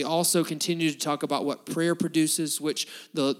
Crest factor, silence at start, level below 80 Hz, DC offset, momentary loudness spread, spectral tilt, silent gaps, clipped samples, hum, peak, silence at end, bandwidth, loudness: 14 dB; 0 s; -84 dBFS; under 0.1%; 6 LU; -3.5 dB/octave; none; under 0.1%; none; -12 dBFS; 0.05 s; 17 kHz; -26 LUFS